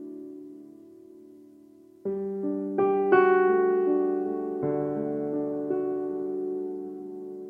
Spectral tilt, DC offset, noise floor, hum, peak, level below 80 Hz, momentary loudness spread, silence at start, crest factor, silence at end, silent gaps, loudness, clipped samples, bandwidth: -9.5 dB/octave; under 0.1%; -53 dBFS; none; -10 dBFS; -72 dBFS; 18 LU; 0 s; 18 dB; 0 s; none; -27 LUFS; under 0.1%; 3.2 kHz